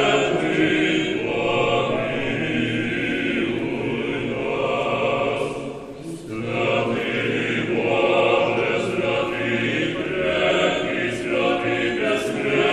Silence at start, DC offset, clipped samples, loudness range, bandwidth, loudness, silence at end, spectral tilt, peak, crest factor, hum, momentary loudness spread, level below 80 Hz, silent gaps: 0 s; under 0.1%; under 0.1%; 3 LU; 12 kHz; -22 LUFS; 0 s; -5.5 dB/octave; -6 dBFS; 16 dB; none; 6 LU; -50 dBFS; none